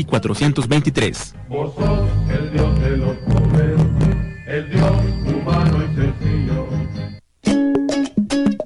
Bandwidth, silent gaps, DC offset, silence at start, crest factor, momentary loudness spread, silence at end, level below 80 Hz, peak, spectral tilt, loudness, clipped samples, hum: 11.5 kHz; none; under 0.1%; 0 s; 14 dB; 9 LU; 0 s; -26 dBFS; -4 dBFS; -7 dB/octave; -18 LUFS; under 0.1%; none